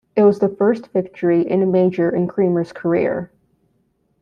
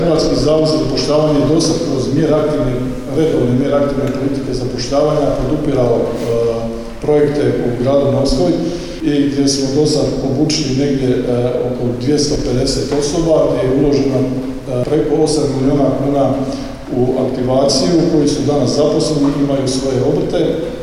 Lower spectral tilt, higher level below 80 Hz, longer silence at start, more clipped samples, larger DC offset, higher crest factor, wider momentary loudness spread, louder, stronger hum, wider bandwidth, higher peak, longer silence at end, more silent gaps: first, -9.5 dB/octave vs -6 dB/octave; second, -60 dBFS vs -30 dBFS; first, 0.15 s vs 0 s; neither; neither; about the same, 14 dB vs 12 dB; about the same, 7 LU vs 6 LU; second, -18 LUFS vs -15 LUFS; neither; second, 6.6 kHz vs 13 kHz; about the same, -4 dBFS vs -2 dBFS; first, 0.95 s vs 0 s; neither